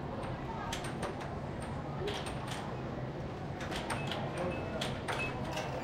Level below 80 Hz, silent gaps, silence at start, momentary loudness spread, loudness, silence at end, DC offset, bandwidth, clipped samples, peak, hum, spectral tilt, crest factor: -52 dBFS; none; 0 s; 5 LU; -38 LUFS; 0 s; under 0.1%; 16.5 kHz; under 0.1%; -20 dBFS; none; -5 dB/octave; 18 dB